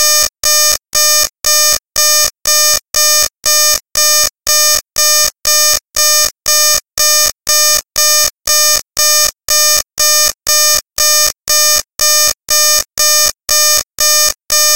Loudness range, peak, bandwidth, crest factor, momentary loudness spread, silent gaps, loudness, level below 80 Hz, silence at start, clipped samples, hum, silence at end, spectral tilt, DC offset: 0 LU; 0 dBFS; 17.5 kHz; 12 dB; 2 LU; none; -8 LUFS; -42 dBFS; 0 s; under 0.1%; none; 0 s; 3 dB/octave; 3%